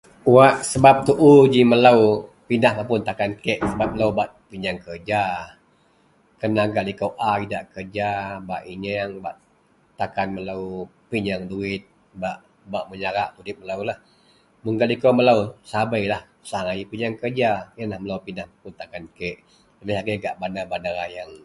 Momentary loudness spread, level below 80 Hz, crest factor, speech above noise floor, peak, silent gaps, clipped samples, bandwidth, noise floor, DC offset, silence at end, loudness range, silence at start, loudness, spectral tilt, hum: 18 LU; -52 dBFS; 22 dB; 39 dB; 0 dBFS; none; under 0.1%; 11.5 kHz; -60 dBFS; under 0.1%; 0.1 s; 12 LU; 0.25 s; -21 LUFS; -6 dB/octave; none